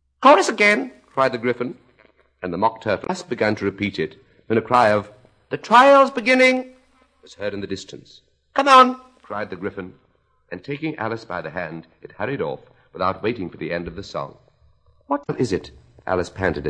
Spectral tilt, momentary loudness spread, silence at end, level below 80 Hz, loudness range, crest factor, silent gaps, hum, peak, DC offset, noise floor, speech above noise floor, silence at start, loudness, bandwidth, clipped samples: -5 dB/octave; 19 LU; 0 s; -54 dBFS; 11 LU; 20 dB; none; none; 0 dBFS; under 0.1%; -59 dBFS; 40 dB; 0.2 s; -20 LUFS; 10.5 kHz; under 0.1%